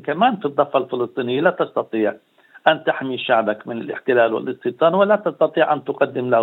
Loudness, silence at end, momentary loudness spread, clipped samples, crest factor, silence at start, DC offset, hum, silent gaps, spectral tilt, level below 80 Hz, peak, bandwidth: -19 LUFS; 0 s; 7 LU; under 0.1%; 20 dB; 0.05 s; under 0.1%; none; none; -8.5 dB/octave; -74 dBFS; 0 dBFS; 16.5 kHz